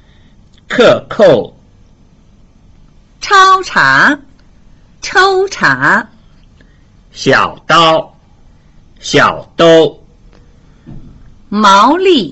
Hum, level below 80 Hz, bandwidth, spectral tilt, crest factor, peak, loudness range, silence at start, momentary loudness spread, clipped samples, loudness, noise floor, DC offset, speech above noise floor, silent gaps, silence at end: none; -42 dBFS; 8.2 kHz; -4 dB/octave; 12 dB; 0 dBFS; 3 LU; 0.7 s; 14 LU; under 0.1%; -9 LUFS; -43 dBFS; under 0.1%; 35 dB; none; 0 s